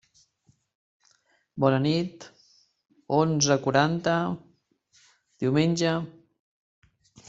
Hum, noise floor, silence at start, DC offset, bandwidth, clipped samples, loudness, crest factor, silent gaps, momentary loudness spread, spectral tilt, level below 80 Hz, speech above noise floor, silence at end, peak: none; -67 dBFS; 1.55 s; under 0.1%; 8 kHz; under 0.1%; -25 LUFS; 22 dB; none; 15 LU; -5 dB/octave; -64 dBFS; 43 dB; 1.2 s; -6 dBFS